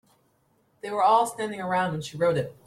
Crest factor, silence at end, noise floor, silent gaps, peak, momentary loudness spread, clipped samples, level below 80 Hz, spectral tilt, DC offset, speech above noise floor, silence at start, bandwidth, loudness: 18 dB; 0.15 s; -67 dBFS; none; -8 dBFS; 11 LU; under 0.1%; -66 dBFS; -5 dB/octave; under 0.1%; 42 dB; 0.85 s; 15.5 kHz; -25 LUFS